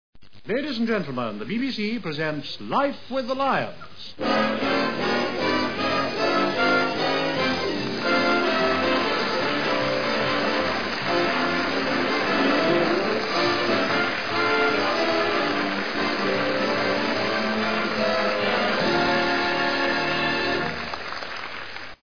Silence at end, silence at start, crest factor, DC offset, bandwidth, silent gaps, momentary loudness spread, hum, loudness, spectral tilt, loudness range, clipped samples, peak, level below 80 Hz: 0 s; 0.1 s; 14 dB; 1%; 5.4 kHz; none; 7 LU; none; -23 LUFS; -4.5 dB/octave; 4 LU; under 0.1%; -8 dBFS; -56 dBFS